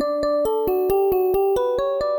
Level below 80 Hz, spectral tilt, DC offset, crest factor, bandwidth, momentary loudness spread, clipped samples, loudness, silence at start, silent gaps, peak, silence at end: -46 dBFS; -6 dB/octave; under 0.1%; 10 dB; 19.5 kHz; 2 LU; under 0.1%; -20 LUFS; 0 s; none; -10 dBFS; 0 s